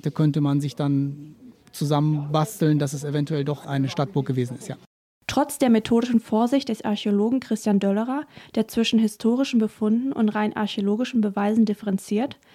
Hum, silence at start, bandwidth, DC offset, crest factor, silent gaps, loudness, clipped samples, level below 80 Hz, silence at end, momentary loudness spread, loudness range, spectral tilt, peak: none; 0.05 s; 15.5 kHz; under 0.1%; 16 dB; 4.86-5.21 s; -23 LUFS; under 0.1%; -62 dBFS; 0.2 s; 7 LU; 3 LU; -6.5 dB/octave; -8 dBFS